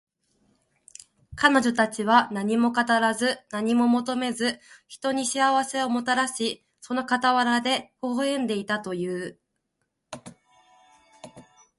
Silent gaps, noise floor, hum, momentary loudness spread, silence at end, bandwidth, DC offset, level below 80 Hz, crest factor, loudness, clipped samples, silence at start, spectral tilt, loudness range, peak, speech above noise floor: none; -78 dBFS; none; 12 LU; 0.4 s; 11.5 kHz; under 0.1%; -66 dBFS; 22 dB; -24 LUFS; under 0.1%; 1.3 s; -3.5 dB/octave; 9 LU; -4 dBFS; 54 dB